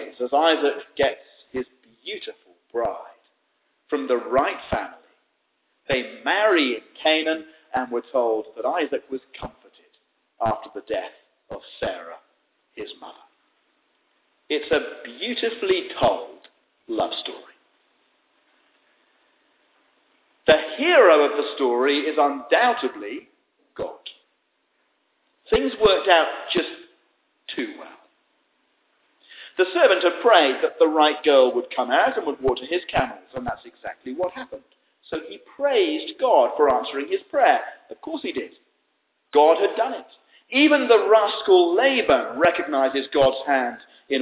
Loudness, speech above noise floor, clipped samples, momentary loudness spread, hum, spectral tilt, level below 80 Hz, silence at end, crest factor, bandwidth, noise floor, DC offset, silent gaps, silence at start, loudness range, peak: -21 LUFS; 50 dB; under 0.1%; 20 LU; none; -8 dB/octave; -56 dBFS; 0 s; 20 dB; 4 kHz; -71 dBFS; under 0.1%; none; 0 s; 13 LU; -2 dBFS